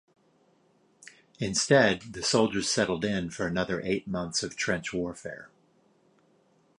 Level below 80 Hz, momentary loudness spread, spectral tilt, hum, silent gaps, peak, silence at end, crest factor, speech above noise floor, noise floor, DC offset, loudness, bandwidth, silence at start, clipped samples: -58 dBFS; 13 LU; -3.5 dB/octave; none; none; -8 dBFS; 1.3 s; 22 dB; 38 dB; -66 dBFS; under 0.1%; -28 LUFS; 11.5 kHz; 1.05 s; under 0.1%